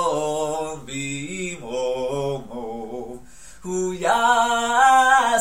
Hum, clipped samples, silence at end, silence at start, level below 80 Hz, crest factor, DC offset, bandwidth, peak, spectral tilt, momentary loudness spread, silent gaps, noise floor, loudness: none; under 0.1%; 0 s; 0 s; -50 dBFS; 18 dB; 0.7%; 16 kHz; -4 dBFS; -3 dB/octave; 17 LU; none; -44 dBFS; -21 LUFS